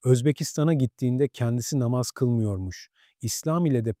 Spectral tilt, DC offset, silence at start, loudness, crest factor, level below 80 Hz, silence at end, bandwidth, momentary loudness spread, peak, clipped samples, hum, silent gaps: -6.5 dB/octave; under 0.1%; 0.05 s; -25 LUFS; 18 dB; -58 dBFS; 0.05 s; 16 kHz; 9 LU; -8 dBFS; under 0.1%; none; none